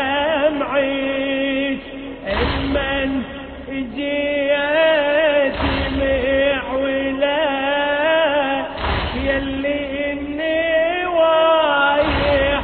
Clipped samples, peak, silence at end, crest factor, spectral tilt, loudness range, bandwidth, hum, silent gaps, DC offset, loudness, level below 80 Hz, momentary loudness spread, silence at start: under 0.1%; -6 dBFS; 0 s; 14 dB; -9 dB/octave; 4 LU; 4.5 kHz; none; none; under 0.1%; -18 LUFS; -34 dBFS; 8 LU; 0 s